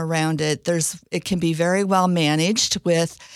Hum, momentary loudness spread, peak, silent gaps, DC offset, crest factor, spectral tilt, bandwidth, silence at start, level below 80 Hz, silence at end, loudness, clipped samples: none; 4 LU; -6 dBFS; none; under 0.1%; 16 dB; -4 dB/octave; 15 kHz; 0 s; -54 dBFS; 0 s; -20 LUFS; under 0.1%